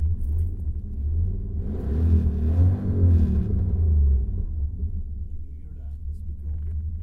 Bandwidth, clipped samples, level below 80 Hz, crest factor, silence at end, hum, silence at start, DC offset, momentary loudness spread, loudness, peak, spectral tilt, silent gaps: 1.9 kHz; under 0.1%; -28 dBFS; 14 dB; 0 s; none; 0 s; under 0.1%; 15 LU; -25 LUFS; -8 dBFS; -11.5 dB/octave; none